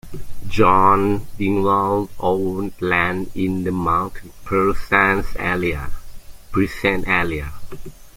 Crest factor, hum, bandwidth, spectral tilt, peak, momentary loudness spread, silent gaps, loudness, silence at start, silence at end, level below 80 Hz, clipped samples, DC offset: 18 dB; none; 16.5 kHz; -6.5 dB/octave; -2 dBFS; 17 LU; none; -19 LUFS; 0.05 s; 0.05 s; -34 dBFS; under 0.1%; under 0.1%